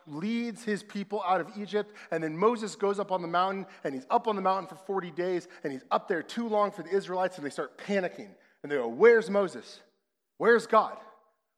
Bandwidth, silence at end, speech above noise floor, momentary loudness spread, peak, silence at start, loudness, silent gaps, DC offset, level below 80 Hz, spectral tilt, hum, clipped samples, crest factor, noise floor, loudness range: 11.5 kHz; 0.5 s; 49 dB; 13 LU; -8 dBFS; 0.05 s; -29 LUFS; none; under 0.1%; under -90 dBFS; -5.5 dB/octave; none; under 0.1%; 22 dB; -78 dBFS; 5 LU